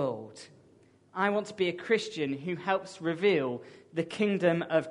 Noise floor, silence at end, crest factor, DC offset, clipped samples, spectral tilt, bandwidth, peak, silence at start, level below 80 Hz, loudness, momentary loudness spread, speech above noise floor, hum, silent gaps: -61 dBFS; 0 s; 18 dB; under 0.1%; under 0.1%; -6 dB/octave; 10.5 kHz; -12 dBFS; 0 s; -76 dBFS; -30 LUFS; 14 LU; 31 dB; none; none